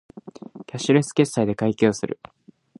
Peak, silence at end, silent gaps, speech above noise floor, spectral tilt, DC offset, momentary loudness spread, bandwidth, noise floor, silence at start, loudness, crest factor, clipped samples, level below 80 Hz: -4 dBFS; 0.65 s; none; 20 dB; -6 dB/octave; under 0.1%; 21 LU; 11.5 kHz; -41 dBFS; 0.15 s; -22 LUFS; 20 dB; under 0.1%; -60 dBFS